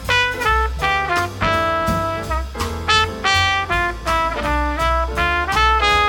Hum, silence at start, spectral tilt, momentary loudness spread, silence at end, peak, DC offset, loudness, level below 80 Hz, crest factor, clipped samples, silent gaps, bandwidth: none; 0 s; -3.5 dB/octave; 6 LU; 0 s; -2 dBFS; under 0.1%; -18 LUFS; -28 dBFS; 16 dB; under 0.1%; none; 17.5 kHz